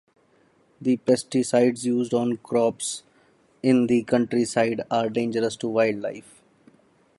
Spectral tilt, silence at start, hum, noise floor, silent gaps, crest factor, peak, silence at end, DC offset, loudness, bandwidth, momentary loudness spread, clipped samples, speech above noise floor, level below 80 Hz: -5 dB/octave; 0.8 s; none; -61 dBFS; none; 18 dB; -6 dBFS; 1 s; under 0.1%; -23 LUFS; 11.5 kHz; 9 LU; under 0.1%; 39 dB; -66 dBFS